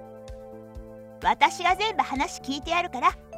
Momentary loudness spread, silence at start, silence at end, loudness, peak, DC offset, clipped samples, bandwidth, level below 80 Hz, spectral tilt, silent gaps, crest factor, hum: 21 LU; 0 s; 0 s; -25 LUFS; -4 dBFS; under 0.1%; under 0.1%; 15.5 kHz; -48 dBFS; -3 dB/octave; none; 22 dB; none